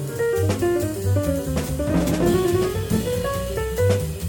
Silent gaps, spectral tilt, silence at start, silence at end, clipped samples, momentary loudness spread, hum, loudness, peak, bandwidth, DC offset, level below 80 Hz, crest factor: none; -6 dB/octave; 0 s; 0 s; under 0.1%; 5 LU; none; -22 LUFS; -6 dBFS; 17.5 kHz; under 0.1%; -34 dBFS; 16 dB